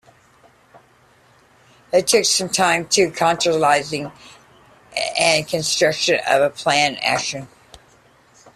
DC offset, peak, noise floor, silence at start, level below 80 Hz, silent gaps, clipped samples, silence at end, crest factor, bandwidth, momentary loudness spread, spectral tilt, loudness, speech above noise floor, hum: under 0.1%; -2 dBFS; -54 dBFS; 1.95 s; -58 dBFS; none; under 0.1%; 1.1 s; 20 dB; 15 kHz; 10 LU; -2 dB/octave; -18 LUFS; 36 dB; none